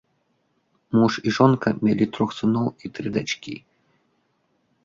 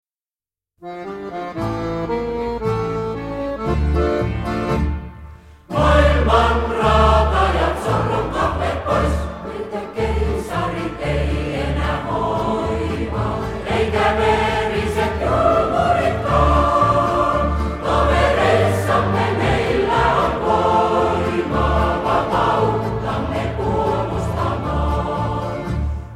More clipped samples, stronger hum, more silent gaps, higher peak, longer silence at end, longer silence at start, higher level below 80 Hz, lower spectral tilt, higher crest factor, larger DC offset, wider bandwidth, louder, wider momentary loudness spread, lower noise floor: neither; neither; neither; about the same, -4 dBFS vs -2 dBFS; first, 1.25 s vs 0 s; about the same, 0.9 s vs 0.8 s; second, -60 dBFS vs -26 dBFS; about the same, -6.5 dB/octave vs -6.5 dB/octave; about the same, 20 dB vs 16 dB; neither; second, 7.6 kHz vs 13 kHz; second, -22 LUFS vs -19 LUFS; first, 12 LU vs 9 LU; second, -69 dBFS vs under -90 dBFS